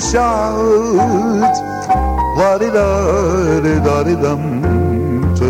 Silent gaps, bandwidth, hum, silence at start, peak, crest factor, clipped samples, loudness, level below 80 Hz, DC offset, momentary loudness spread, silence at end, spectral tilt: none; 16 kHz; none; 0 s; -2 dBFS; 12 dB; under 0.1%; -14 LUFS; -26 dBFS; under 0.1%; 3 LU; 0 s; -6.5 dB/octave